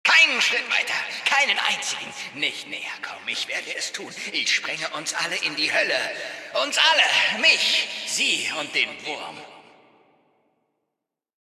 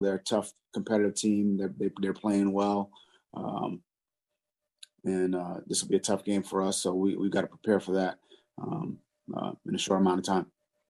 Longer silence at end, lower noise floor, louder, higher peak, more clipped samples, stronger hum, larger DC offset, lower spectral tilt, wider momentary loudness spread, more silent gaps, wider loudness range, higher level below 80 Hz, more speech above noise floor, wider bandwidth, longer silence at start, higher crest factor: first, 1.95 s vs 0.45 s; second, -84 dBFS vs -89 dBFS; first, -21 LUFS vs -30 LUFS; first, -4 dBFS vs -12 dBFS; neither; neither; neither; second, 0.5 dB/octave vs -5 dB/octave; first, 15 LU vs 12 LU; neither; first, 7 LU vs 4 LU; second, -80 dBFS vs -72 dBFS; about the same, 59 dB vs 59 dB; first, 14.5 kHz vs 12.5 kHz; about the same, 0.05 s vs 0 s; about the same, 20 dB vs 18 dB